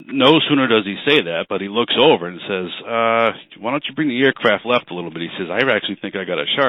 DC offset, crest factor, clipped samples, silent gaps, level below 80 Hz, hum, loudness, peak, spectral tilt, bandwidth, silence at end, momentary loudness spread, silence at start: under 0.1%; 16 dB; under 0.1%; none; -64 dBFS; none; -17 LUFS; -2 dBFS; -6.5 dB/octave; 6.2 kHz; 0 s; 11 LU; 0 s